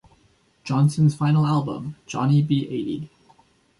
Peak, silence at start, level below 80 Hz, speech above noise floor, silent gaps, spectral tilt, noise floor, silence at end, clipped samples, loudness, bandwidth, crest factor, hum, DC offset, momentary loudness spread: -8 dBFS; 0.65 s; -60 dBFS; 40 dB; none; -7.5 dB/octave; -61 dBFS; 0.75 s; under 0.1%; -22 LUFS; 11.5 kHz; 14 dB; none; under 0.1%; 14 LU